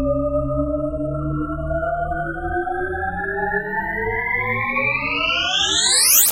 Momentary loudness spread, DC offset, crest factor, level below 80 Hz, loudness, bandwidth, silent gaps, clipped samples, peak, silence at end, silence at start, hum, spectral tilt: 10 LU; under 0.1%; 20 dB; -34 dBFS; -19 LUFS; 16 kHz; none; under 0.1%; 0 dBFS; 0 s; 0 s; none; -2 dB/octave